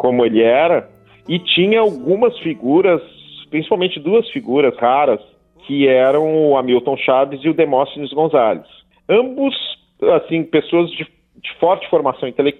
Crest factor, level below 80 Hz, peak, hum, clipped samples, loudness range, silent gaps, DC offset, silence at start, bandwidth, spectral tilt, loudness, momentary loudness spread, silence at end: 14 dB; -60 dBFS; 0 dBFS; none; under 0.1%; 3 LU; none; under 0.1%; 0 s; 4.2 kHz; -8 dB/octave; -16 LUFS; 10 LU; 0.05 s